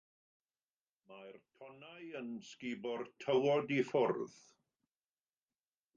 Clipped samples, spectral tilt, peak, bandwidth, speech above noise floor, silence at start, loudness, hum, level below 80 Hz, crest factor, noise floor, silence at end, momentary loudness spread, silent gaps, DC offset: under 0.1%; -6 dB/octave; -22 dBFS; 7.6 kHz; over 52 dB; 1.1 s; -37 LUFS; none; -86 dBFS; 18 dB; under -90 dBFS; 1.7 s; 23 LU; none; under 0.1%